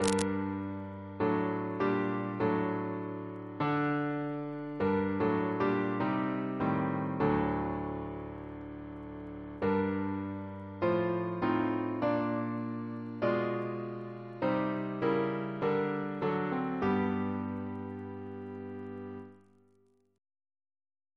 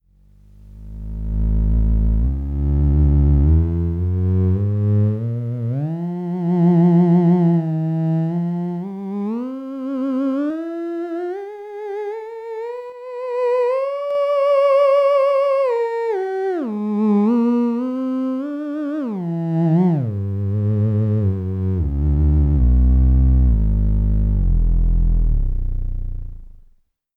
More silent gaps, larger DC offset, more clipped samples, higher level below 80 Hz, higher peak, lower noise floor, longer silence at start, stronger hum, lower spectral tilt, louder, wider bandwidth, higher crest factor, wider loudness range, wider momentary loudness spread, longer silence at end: neither; neither; neither; second, -60 dBFS vs -22 dBFS; about the same, -8 dBFS vs -6 dBFS; first, -69 dBFS vs -55 dBFS; second, 0 s vs 0.65 s; neither; second, -7 dB/octave vs -11 dB/octave; second, -33 LUFS vs -19 LUFS; first, 11 kHz vs 5.4 kHz; first, 26 dB vs 12 dB; about the same, 5 LU vs 7 LU; about the same, 12 LU vs 13 LU; first, 1.8 s vs 0.7 s